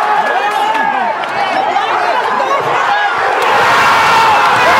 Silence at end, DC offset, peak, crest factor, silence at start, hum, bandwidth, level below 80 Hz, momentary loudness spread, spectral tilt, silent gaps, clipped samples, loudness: 0 s; under 0.1%; 0 dBFS; 12 dB; 0 s; none; 16.5 kHz; -52 dBFS; 6 LU; -2.5 dB/octave; none; under 0.1%; -11 LUFS